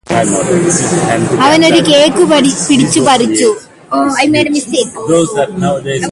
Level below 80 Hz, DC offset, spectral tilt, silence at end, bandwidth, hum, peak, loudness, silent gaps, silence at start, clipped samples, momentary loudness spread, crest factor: -44 dBFS; under 0.1%; -4 dB/octave; 0 s; 11.5 kHz; none; 0 dBFS; -10 LUFS; none; 0.1 s; under 0.1%; 7 LU; 10 dB